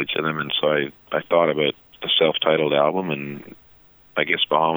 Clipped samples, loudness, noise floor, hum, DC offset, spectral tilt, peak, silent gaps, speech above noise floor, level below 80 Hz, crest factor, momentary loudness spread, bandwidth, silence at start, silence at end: under 0.1%; -21 LUFS; -52 dBFS; none; under 0.1%; -7 dB/octave; -2 dBFS; none; 31 dB; -64 dBFS; 18 dB; 11 LU; over 20 kHz; 0 s; 0 s